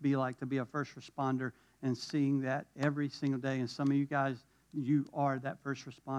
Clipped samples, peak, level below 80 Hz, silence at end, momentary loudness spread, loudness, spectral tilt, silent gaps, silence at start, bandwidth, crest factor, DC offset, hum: under 0.1%; -18 dBFS; -78 dBFS; 0 s; 9 LU; -35 LUFS; -7 dB/octave; none; 0 s; 9.6 kHz; 16 dB; under 0.1%; none